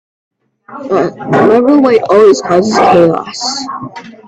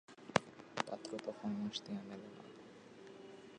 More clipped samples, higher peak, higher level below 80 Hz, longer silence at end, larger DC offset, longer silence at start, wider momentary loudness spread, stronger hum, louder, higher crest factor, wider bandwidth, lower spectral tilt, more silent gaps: neither; first, 0 dBFS vs -12 dBFS; first, -52 dBFS vs -78 dBFS; first, 0.15 s vs 0 s; neither; first, 0.7 s vs 0.1 s; second, 14 LU vs 18 LU; neither; first, -9 LUFS vs -43 LUFS; second, 10 dB vs 32 dB; about the same, 9.2 kHz vs 10 kHz; about the same, -5 dB/octave vs -4.5 dB/octave; neither